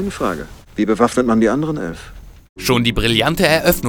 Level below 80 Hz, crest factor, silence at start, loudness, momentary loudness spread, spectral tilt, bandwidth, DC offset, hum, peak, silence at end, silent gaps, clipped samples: -34 dBFS; 18 dB; 0 s; -16 LUFS; 14 LU; -5 dB/octave; over 20 kHz; 0.2%; none; 0 dBFS; 0 s; 2.49-2.56 s; under 0.1%